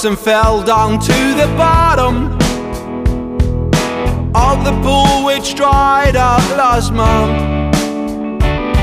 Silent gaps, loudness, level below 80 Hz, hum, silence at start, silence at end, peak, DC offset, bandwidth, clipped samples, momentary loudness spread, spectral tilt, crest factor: none; -13 LUFS; -20 dBFS; none; 0 s; 0 s; 0 dBFS; under 0.1%; 15.5 kHz; under 0.1%; 7 LU; -5.5 dB/octave; 12 dB